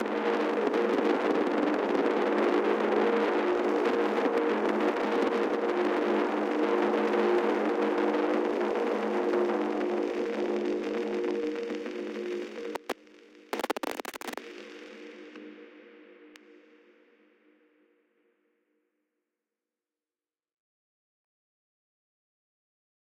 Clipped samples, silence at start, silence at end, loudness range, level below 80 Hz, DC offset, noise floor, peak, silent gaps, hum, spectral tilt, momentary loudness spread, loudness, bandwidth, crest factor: under 0.1%; 0 s; 6.75 s; 12 LU; -74 dBFS; under 0.1%; under -90 dBFS; -14 dBFS; none; none; -5.5 dB/octave; 13 LU; -29 LUFS; 16.5 kHz; 16 dB